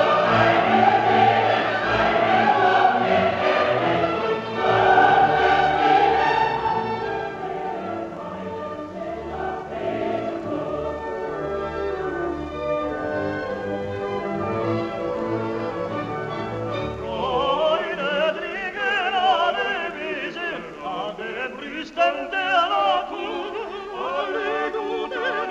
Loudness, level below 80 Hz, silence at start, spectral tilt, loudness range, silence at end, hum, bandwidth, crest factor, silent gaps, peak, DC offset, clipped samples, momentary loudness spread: -22 LUFS; -50 dBFS; 0 s; -5.5 dB/octave; 10 LU; 0 s; none; 8 kHz; 16 dB; none; -6 dBFS; under 0.1%; under 0.1%; 12 LU